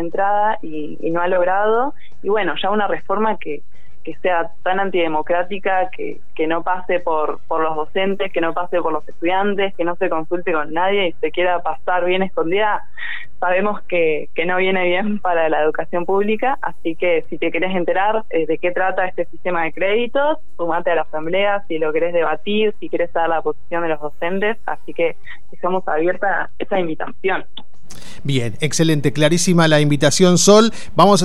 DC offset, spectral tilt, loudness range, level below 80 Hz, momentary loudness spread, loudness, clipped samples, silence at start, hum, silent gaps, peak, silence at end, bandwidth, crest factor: 8%; -4.5 dB/octave; 3 LU; -52 dBFS; 9 LU; -19 LUFS; under 0.1%; 0 s; none; none; 0 dBFS; 0 s; 13.5 kHz; 18 dB